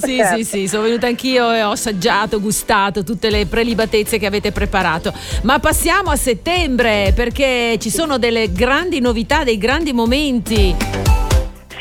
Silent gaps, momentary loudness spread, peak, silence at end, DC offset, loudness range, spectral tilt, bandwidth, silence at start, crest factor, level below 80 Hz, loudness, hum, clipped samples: none; 4 LU; -2 dBFS; 0 s; under 0.1%; 1 LU; -4 dB/octave; 18.5 kHz; 0 s; 14 dB; -24 dBFS; -16 LUFS; none; under 0.1%